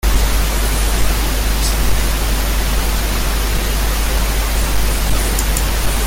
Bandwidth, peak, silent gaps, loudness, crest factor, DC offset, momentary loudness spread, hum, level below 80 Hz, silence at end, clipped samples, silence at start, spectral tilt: 17 kHz; -4 dBFS; none; -17 LUFS; 12 dB; under 0.1%; 1 LU; none; -16 dBFS; 0 s; under 0.1%; 0.05 s; -3.5 dB/octave